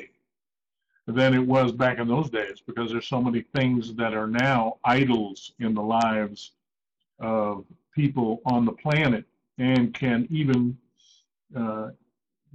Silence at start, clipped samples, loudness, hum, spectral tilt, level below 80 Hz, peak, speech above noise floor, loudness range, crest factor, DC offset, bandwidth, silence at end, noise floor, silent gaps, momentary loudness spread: 0 s; under 0.1%; -25 LUFS; none; -7.5 dB/octave; -58 dBFS; -12 dBFS; over 66 dB; 3 LU; 14 dB; under 0.1%; 8 kHz; 0.65 s; under -90 dBFS; none; 13 LU